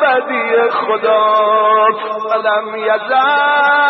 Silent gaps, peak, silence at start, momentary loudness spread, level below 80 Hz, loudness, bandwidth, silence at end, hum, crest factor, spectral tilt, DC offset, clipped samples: none; -2 dBFS; 0 s; 6 LU; -74 dBFS; -13 LUFS; 6 kHz; 0 s; none; 10 dB; -5.5 dB/octave; under 0.1%; under 0.1%